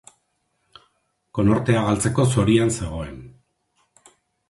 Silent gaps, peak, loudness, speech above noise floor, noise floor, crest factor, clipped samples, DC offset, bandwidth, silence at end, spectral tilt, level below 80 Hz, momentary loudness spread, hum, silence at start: none; -4 dBFS; -20 LUFS; 51 dB; -71 dBFS; 20 dB; under 0.1%; under 0.1%; 11.5 kHz; 1.2 s; -6 dB/octave; -42 dBFS; 15 LU; none; 1.35 s